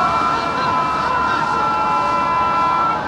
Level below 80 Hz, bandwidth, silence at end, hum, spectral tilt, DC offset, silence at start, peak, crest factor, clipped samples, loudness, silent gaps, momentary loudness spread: -44 dBFS; 11.5 kHz; 0 s; none; -4.5 dB/octave; under 0.1%; 0 s; -6 dBFS; 12 dB; under 0.1%; -17 LUFS; none; 2 LU